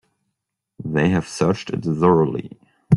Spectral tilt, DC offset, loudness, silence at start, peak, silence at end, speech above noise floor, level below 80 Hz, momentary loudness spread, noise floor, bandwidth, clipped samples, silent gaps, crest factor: -7 dB/octave; under 0.1%; -20 LUFS; 0.8 s; -2 dBFS; 0 s; 60 dB; -52 dBFS; 15 LU; -79 dBFS; 11.5 kHz; under 0.1%; none; 18 dB